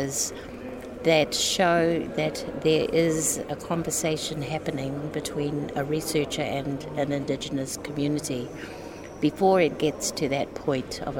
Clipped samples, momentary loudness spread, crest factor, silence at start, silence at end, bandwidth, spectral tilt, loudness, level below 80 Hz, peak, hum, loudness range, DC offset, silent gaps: under 0.1%; 10 LU; 18 dB; 0 s; 0 s; 17 kHz; -4 dB/octave; -26 LUFS; -52 dBFS; -8 dBFS; none; 5 LU; under 0.1%; none